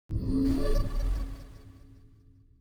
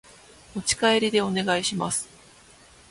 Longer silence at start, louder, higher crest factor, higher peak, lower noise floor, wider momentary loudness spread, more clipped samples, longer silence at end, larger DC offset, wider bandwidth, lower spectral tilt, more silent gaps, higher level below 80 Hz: second, 0.1 s vs 0.55 s; second, -31 LUFS vs -24 LUFS; about the same, 16 dB vs 18 dB; second, -14 dBFS vs -8 dBFS; first, -57 dBFS vs -52 dBFS; first, 23 LU vs 11 LU; neither; about the same, 0.9 s vs 0.85 s; neither; first, 15 kHz vs 11.5 kHz; first, -7.5 dB/octave vs -3 dB/octave; neither; first, -32 dBFS vs -56 dBFS